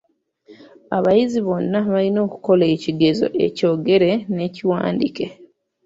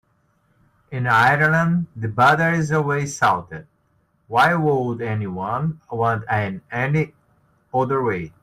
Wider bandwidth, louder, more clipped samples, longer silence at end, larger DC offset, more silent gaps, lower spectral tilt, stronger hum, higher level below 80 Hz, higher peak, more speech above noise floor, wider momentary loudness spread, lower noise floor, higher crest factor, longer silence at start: second, 7.8 kHz vs 15 kHz; about the same, -19 LUFS vs -20 LUFS; neither; first, 0.4 s vs 0.15 s; neither; neither; first, -7.5 dB/octave vs -6 dB/octave; neither; about the same, -58 dBFS vs -56 dBFS; about the same, -2 dBFS vs -4 dBFS; second, 33 dB vs 44 dB; second, 7 LU vs 11 LU; second, -51 dBFS vs -64 dBFS; about the same, 16 dB vs 16 dB; second, 0.5 s vs 0.9 s